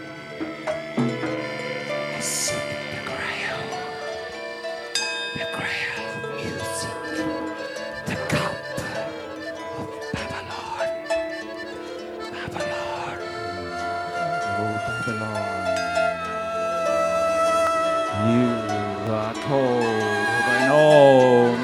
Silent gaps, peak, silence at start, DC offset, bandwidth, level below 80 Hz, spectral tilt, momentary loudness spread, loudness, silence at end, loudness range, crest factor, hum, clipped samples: none; -2 dBFS; 0 s; under 0.1%; 15 kHz; -56 dBFS; -4.5 dB/octave; 12 LU; -24 LUFS; 0 s; 7 LU; 20 dB; none; under 0.1%